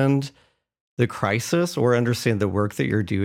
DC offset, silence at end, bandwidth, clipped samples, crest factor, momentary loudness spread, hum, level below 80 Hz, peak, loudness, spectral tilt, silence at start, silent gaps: under 0.1%; 0 s; 16.5 kHz; under 0.1%; 16 dB; 5 LU; none; -60 dBFS; -6 dBFS; -23 LUFS; -6 dB/octave; 0 s; 0.81-0.97 s